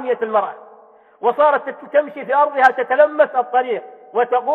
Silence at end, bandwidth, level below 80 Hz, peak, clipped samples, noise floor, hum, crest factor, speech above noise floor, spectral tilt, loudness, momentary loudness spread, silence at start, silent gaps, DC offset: 0 s; 6.4 kHz; -74 dBFS; 0 dBFS; under 0.1%; -47 dBFS; none; 18 dB; 30 dB; -5 dB/octave; -17 LUFS; 9 LU; 0 s; none; under 0.1%